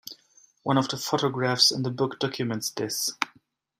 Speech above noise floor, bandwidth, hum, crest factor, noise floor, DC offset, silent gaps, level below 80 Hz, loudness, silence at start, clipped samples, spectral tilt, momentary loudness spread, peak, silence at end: 37 dB; 16 kHz; none; 24 dB; -63 dBFS; under 0.1%; none; -70 dBFS; -26 LUFS; 0.05 s; under 0.1%; -3.5 dB/octave; 12 LU; -4 dBFS; 0.5 s